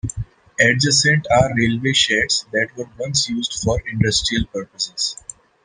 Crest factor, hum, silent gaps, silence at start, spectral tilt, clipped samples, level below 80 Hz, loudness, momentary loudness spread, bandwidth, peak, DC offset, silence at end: 18 dB; none; none; 0.05 s; -3.5 dB/octave; under 0.1%; -40 dBFS; -18 LUFS; 14 LU; 11 kHz; 0 dBFS; under 0.1%; 0.5 s